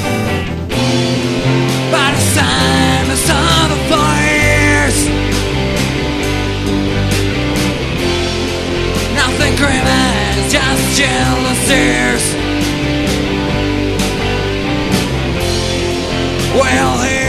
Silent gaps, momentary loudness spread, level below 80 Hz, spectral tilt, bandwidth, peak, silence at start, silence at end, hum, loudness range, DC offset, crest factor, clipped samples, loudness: none; 6 LU; -24 dBFS; -4 dB/octave; 13.5 kHz; 0 dBFS; 0 s; 0 s; none; 4 LU; under 0.1%; 14 dB; under 0.1%; -13 LUFS